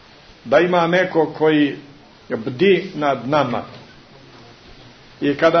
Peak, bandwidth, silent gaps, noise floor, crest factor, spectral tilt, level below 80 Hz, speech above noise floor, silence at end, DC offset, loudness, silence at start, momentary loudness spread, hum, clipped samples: -2 dBFS; 6.4 kHz; none; -44 dBFS; 16 dB; -6.5 dB/octave; -56 dBFS; 27 dB; 0 s; under 0.1%; -18 LUFS; 0.45 s; 12 LU; none; under 0.1%